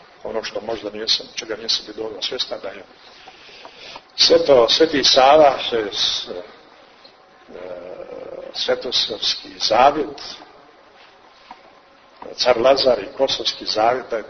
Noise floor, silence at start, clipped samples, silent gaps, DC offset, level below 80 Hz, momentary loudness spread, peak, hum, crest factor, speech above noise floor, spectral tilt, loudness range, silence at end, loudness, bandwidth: -49 dBFS; 0.25 s; under 0.1%; none; under 0.1%; -54 dBFS; 21 LU; 0 dBFS; none; 20 dB; 31 dB; -2 dB/octave; 9 LU; 0 s; -17 LUFS; 6.6 kHz